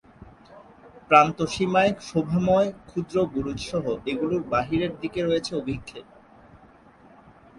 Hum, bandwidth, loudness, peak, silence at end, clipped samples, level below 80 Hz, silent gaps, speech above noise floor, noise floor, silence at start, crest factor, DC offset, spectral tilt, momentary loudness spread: none; 11.5 kHz; -24 LUFS; -2 dBFS; 1.55 s; under 0.1%; -52 dBFS; none; 29 dB; -52 dBFS; 0.2 s; 24 dB; under 0.1%; -6 dB/octave; 12 LU